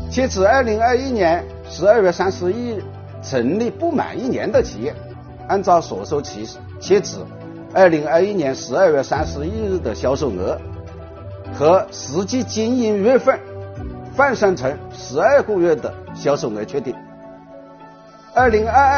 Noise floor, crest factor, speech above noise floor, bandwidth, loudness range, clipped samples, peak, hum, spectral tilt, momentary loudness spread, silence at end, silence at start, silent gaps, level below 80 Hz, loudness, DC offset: -42 dBFS; 18 dB; 25 dB; 6.8 kHz; 3 LU; under 0.1%; 0 dBFS; none; -5 dB/octave; 18 LU; 0 s; 0 s; none; -40 dBFS; -18 LUFS; under 0.1%